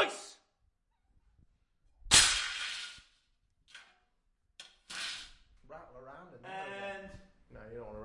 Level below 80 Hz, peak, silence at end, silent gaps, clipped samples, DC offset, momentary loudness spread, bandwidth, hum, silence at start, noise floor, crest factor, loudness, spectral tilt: -58 dBFS; -8 dBFS; 0 s; none; under 0.1%; under 0.1%; 30 LU; 11.5 kHz; none; 0 s; -76 dBFS; 30 dB; -29 LUFS; 0 dB/octave